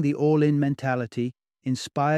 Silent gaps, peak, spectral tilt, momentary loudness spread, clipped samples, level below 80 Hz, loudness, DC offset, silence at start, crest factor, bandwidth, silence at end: none; -10 dBFS; -7 dB/octave; 11 LU; under 0.1%; -66 dBFS; -25 LUFS; under 0.1%; 0 s; 14 dB; 11.5 kHz; 0 s